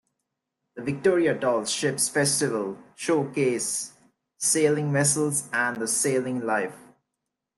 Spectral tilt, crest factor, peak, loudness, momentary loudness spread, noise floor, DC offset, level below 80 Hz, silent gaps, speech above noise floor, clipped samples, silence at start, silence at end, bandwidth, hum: -3.5 dB/octave; 18 dB; -8 dBFS; -24 LUFS; 9 LU; -84 dBFS; under 0.1%; -70 dBFS; none; 59 dB; under 0.1%; 0.75 s; 0.8 s; 12.5 kHz; none